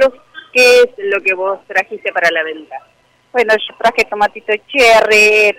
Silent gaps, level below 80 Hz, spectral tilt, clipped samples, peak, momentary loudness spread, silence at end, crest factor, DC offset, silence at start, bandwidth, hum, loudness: none; -50 dBFS; -1.5 dB/octave; under 0.1%; -2 dBFS; 12 LU; 0.05 s; 10 dB; under 0.1%; 0 s; 16.5 kHz; none; -12 LUFS